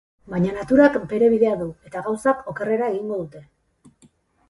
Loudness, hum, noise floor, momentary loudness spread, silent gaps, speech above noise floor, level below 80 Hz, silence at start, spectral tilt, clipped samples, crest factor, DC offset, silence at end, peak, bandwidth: -21 LUFS; none; -57 dBFS; 14 LU; none; 37 dB; -54 dBFS; 0.3 s; -7.5 dB/octave; under 0.1%; 18 dB; under 0.1%; 1.05 s; -2 dBFS; 11.5 kHz